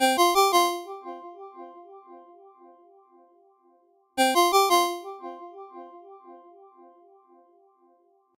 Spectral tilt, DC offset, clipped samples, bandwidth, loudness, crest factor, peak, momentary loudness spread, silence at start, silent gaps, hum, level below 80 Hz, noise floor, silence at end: 0 dB/octave; under 0.1%; under 0.1%; 16 kHz; -22 LUFS; 20 dB; -8 dBFS; 26 LU; 0 s; none; none; -72 dBFS; -63 dBFS; 2.05 s